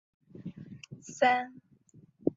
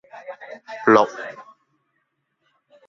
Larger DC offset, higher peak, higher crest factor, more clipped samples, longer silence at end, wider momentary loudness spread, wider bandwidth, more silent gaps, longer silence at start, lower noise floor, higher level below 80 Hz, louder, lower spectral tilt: neither; second, -12 dBFS vs -2 dBFS; about the same, 22 dB vs 22 dB; neither; second, 0.05 s vs 1.45 s; about the same, 21 LU vs 23 LU; about the same, 7.8 kHz vs 7.4 kHz; neither; first, 0.4 s vs 0.15 s; second, -60 dBFS vs -73 dBFS; about the same, -72 dBFS vs -68 dBFS; second, -29 LUFS vs -18 LUFS; about the same, -4.5 dB/octave vs -5.5 dB/octave